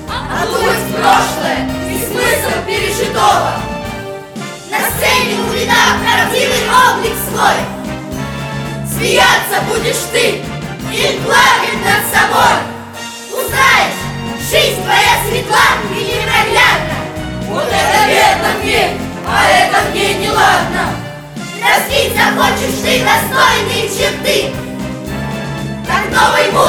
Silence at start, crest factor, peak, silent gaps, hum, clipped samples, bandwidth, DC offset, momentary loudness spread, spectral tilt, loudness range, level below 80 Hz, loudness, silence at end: 0 s; 12 dB; 0 dBFS; none; none; under 0.1%; 20 kHz; under 0.1%; 13 LU; -3 dB/octave; 3 LU; -34 dBFS; -12 LUFS; 0 s